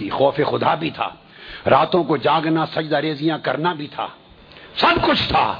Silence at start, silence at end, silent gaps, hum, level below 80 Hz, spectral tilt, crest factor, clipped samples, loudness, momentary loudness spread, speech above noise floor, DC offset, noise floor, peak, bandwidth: 0 s; 0 s; none; none; -46 dBFS; -7.5 dB/octave; 18 dB; under 0.1%; -19 LUFS; 13 LU; 25 dB; under 0.1%; -44 dBFS; -2 dBFS; 5.4 kHz